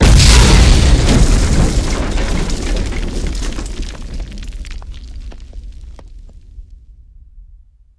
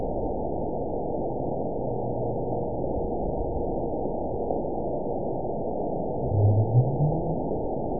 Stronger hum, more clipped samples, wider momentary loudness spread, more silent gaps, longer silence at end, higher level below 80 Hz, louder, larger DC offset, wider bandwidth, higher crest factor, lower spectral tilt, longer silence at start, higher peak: neither; neither; first, 25 LU vs 7 LU; neither; first, 0.6 s vs 0 s; first, -16 dBFS vs -40 dBFS; first, -13 LUFS vs -28 LUFS; second, under 0.1% vs 2%; first, 11 kHz vs 1 kHz; about the same, 14 dB vs 16 dB; second, -4.5 dB/octave vs -19 dB/octave; about the same, 0 s vs 0 s; first, 0 dBFS vs -10 dBFS